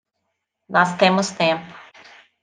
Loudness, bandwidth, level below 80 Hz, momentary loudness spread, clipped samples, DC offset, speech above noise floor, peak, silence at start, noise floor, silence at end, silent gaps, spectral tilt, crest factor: -19 LUFS; 9.8 kHz; -70 dBFS; 10 LU; under 0.1%; under 0.1%; 58 dB; -2 dBFS; 0.7 s; -76 dBFS; 0.6 s; none; -4.5 dB/octave; 20 dB